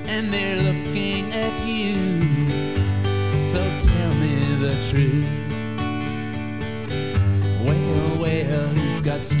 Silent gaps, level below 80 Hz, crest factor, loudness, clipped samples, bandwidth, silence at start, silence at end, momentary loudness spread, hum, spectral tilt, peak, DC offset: none; -32 dBFS; 16 dB; -22 LUFS; under 0.1%; 4 kHz; 0 s; 0 s; 6 LU; none; -11.5 dB/octave; -6 dBFS; 1%